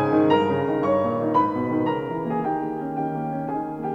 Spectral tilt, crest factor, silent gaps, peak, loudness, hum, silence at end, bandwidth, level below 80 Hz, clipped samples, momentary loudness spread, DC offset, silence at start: -8.5 dB/octave; 16 dB; none; -6 dBFS; -23 LUFS; none; 0 s; 6.6 kHz; -58 dBFS; under 0.1%; 9 LU; under 0.1%; 0 s